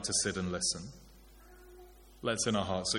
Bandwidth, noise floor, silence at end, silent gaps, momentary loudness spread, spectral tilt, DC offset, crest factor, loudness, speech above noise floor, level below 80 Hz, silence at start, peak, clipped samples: 17 kHz; -56 dBFS; 0 s; none; 13 LU; -3 dB/octave; under 0.1%; 18 dB; -33 LUFS; 23 dB; -58 dBFS; 0 s; -18 dBFS; under 0.1%